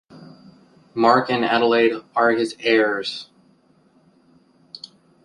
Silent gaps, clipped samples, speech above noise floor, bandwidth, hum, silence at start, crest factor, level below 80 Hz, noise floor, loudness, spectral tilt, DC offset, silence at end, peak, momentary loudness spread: none; under 0.1%; 39 dB; 11 kHz; none; 0.15 s; 20 dB; -68 dBFS; -58 dBFS; -19 LUFS; -5 dB/octave; under 0.1%; 0.45 s; -2 dBFS; 22 LU